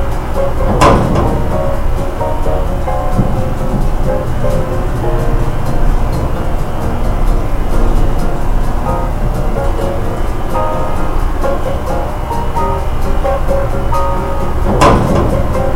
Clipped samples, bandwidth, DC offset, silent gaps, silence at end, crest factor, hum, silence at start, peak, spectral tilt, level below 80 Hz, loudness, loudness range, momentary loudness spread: 0.2%; 15.5 kHz; under 0.1%; none; 0 s; 12 dB; none; 0 s; 0 dBFS; -7 dB/octave; -14 dBFS; -16 LUFS; 3 LU; 7 LU